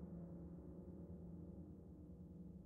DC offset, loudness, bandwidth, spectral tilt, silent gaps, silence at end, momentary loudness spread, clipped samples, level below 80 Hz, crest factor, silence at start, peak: under 0.1%; -56 LUFS; 2.2 kHz; -12 dB/octave; none; 0 s; 4 LU; under 0.1%; -66 dBFS; 12 dB; 0 s; -44 dBFS